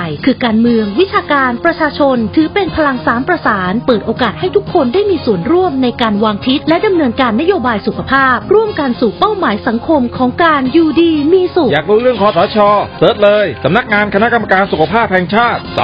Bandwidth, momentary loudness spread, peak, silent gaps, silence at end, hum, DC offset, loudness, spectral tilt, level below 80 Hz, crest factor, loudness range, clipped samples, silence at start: 5.4 kHz; 4 LU; 0 dBFS; none; 0 s; none; under 0.1%; -11 LUFS; -8.5 dB/octave; -38 dBFS; 12 dB; 2 LU; under 0.1%; 0 s